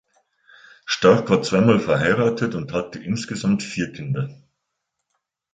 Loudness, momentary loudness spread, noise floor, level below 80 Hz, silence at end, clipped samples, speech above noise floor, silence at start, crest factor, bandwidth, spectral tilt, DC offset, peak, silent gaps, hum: -20 LUFS; 11 LU; -78 dBFS; -54 dBFS; 1.2 s; under 0.1%; 58 dB; 0.85 s; 20 dB; 9.2 kHz; -6 dB/octave; under 0.1%; -2 dBFS; none; none